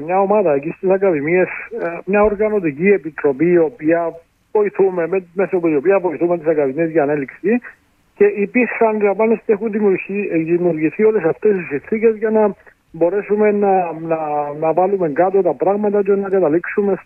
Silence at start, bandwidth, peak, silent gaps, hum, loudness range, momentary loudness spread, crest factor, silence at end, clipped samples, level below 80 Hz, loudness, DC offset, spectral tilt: 0 s; 2.9 kHz; -2 dBFS; none; none; 1 LU; 5 LU; 14 dB; 0.05 s; under 0.1%; -54 dBFS; -17 LUFS; under 0.1%; -11 dB/octave